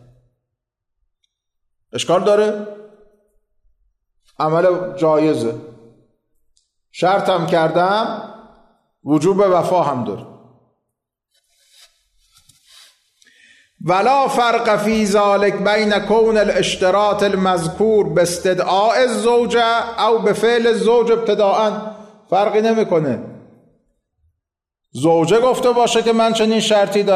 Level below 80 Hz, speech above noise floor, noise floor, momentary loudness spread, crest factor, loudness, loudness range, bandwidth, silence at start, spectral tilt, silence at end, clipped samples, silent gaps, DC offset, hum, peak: -54 dBFS; 65 dB; -80 dBFS; 10 LU; 12 dB; -16 LUFS; 7 LU; 13.5 kHz; 1.95 s; -5 dB/octave; 0 s; under 0.1%; none; under 0.1%; none; -6 dBFS